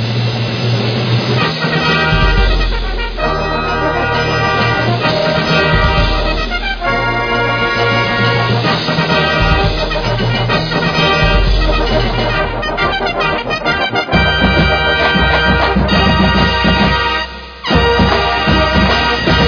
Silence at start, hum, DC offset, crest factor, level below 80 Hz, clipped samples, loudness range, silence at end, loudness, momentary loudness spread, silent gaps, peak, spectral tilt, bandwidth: 0 s; none; under 0.1%; 12 dB; -20 dBFS; under 0.1%; 3 LU; 0 s; -13 LUFS; 5 LU; none; 0 dBFS; -6 dB/octave; 5.4 kHz